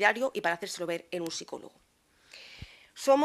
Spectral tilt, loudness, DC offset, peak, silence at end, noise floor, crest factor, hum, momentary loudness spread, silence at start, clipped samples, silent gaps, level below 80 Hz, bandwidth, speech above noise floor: -3 dB/octave; -32 LUFS; under 0.1%; -8 dBFS; 0 s; -58 dBFS; 22 dB; none; 22 LU; 0 s; under 0.1%; none; -66 dBFS; 15 kHz; 29 dB